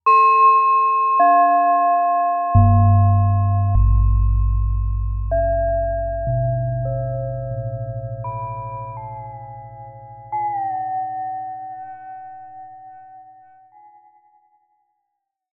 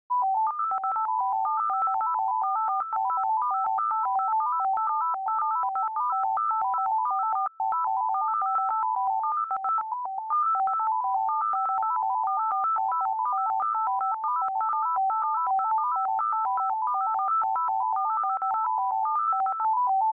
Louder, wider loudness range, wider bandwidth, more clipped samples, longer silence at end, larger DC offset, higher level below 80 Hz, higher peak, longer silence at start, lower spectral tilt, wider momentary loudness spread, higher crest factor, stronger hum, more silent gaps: first, -18 LUFS vs -26 LUFS; first, 15 LU vs 1 LU; first, 4.3 kHz vs 2.7 kHz; neither; first, 2.3 s vs 0.05 s; neither; first, -26 dBFS vs -84 dBFS; first, -4 dBFS vs -20 dBFS; about the same, 0.05 s vs 0.1 s; first, -11 dB/octave vs -5.5 dB/octave; first, 22 LU vs 2 LU; first, 16 dB vs 6 dB; neither; neither